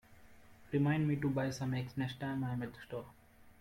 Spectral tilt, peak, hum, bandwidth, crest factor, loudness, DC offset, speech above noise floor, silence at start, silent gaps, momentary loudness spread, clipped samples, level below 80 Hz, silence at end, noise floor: -7 dB/octave; -22 dBFS; none; 16 kHz; 16 dB; -37 LUFS; under 0.1%; 22 dB; 0.1 s; none; 14 LU; under 0.1%; -64 dBFS; 0.1 s; -58 dBFS